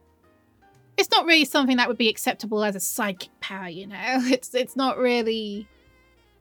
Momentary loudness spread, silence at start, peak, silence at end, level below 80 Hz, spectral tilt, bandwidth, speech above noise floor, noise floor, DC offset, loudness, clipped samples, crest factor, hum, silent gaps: 16 LU; 1 s; -4 dBFS; 0.75 s; -68 dBFS; -2.5 dB/octave; over 20 kHz; 37 dB; -60 dBFS; under 0.1%; -23 LUFS; under 0.1%; 22 dB; none; none